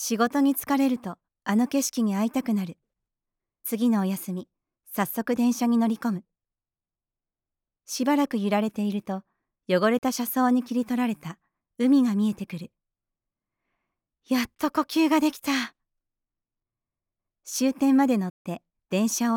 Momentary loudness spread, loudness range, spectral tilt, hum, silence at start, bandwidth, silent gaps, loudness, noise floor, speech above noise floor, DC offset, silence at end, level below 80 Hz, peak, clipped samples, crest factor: 14 LU; 3 LU; -5 dB/octave; none; 0 s; 19.5 kHz; 18.30-18.45 s; -25 LUFS; under -90 dBFS; over 66 dB; under 0.1%; 0 s; -70 dBFS; -10 dBFS; under 0.1%; 16 dB